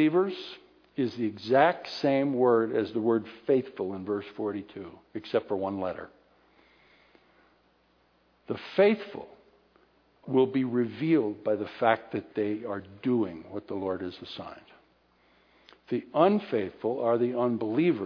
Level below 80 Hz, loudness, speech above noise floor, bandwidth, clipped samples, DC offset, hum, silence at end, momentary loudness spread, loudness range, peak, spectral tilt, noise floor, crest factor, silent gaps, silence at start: -72 dBFS; -28 LUFS; 39 dB; 5.4 kHz; under 0.1%; under 0.1%; none; 0 s; 17 LU; 9 LU; -8 dBFS; -8 dB/octave; -67 dBFS; 22 dB; none; 0 s